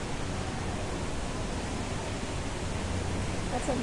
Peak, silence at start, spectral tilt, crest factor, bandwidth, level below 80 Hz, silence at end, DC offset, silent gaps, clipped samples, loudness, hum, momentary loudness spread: -16 dBFS; 0 s; -5 dB/octave; 16 dB; 11.5 kHz; -40 dBFS; 0 s; under 0.1%; none; under 0.1%; -34 LUFS; none; 2 LU